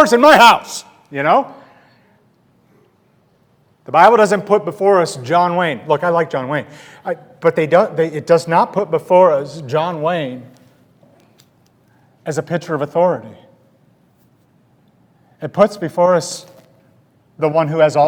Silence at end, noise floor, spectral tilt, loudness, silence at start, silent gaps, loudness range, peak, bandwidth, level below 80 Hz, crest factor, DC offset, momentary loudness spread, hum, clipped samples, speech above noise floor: 0 s; -56 dBFS; -5 dB/octave; -15 LUFS; 0 s; none; 9 LU; 0 dBFS; over 20 kHz; -62 dBFS; 16 dB; under 0.1%; 17 LU; none; 0.2%; 42 dB